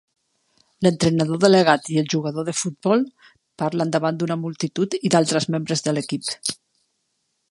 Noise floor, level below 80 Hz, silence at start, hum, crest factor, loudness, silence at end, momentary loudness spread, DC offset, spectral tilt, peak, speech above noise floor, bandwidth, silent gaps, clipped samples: -73 dBFS; -62 dBFS; 0.8 s; none; 20 dB; -21 LUFS; 0.95 s; 11 LU; under 0.1%; -5 dB/octave; 0 dBFS; 52 dB; 11.5 kHz; none; under 0.1%